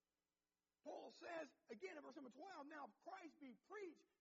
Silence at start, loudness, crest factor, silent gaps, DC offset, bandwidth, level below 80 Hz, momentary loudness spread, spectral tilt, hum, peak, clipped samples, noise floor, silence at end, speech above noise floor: 0.85 s; -58 LUFS; 18 dB; none; under 0.1%; 7.4 kHz; under -90 dBFS; 6 LU; -2 dB/octave; none; -40 dBFS; under 0.1%; under -90 dBFS; 0.15 s; over 32 dB